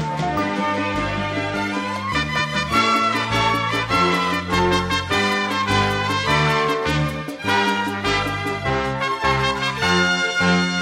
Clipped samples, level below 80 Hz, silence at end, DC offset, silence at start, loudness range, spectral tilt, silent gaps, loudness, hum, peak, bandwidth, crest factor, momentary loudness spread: under 0.1%; -40 dBFS; 0 s; under 0.1%; 0 s; 2 LU; -4.5 dB/octave; none; -20 LUFS; none; -4 dBFS; 16.5 kHz; 16 dB; 6 LU